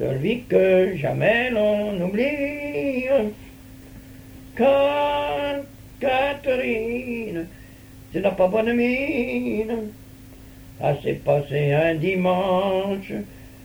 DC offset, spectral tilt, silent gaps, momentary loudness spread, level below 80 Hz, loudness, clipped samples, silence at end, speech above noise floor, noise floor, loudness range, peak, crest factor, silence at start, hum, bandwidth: under 0.1%; -7 dB/octave; none; 13 LU; -48 dBFS; -22 LUFS; under 0.1%; 0 s; 22 dB; -44 dBFS; 3 LU; -6 dBFS; 16 dB; 0 s; none; over 20 kHz